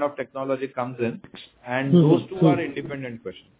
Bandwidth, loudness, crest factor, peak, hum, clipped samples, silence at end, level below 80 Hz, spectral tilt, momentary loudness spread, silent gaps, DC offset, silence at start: 4 kHz; -23 LUFS; 18 dB; -6 dBFS; none; under 0.1%; 0.2 s; -62 dBFS; -12 dB/octave; 19 LU; none; under 0.1%; 0 s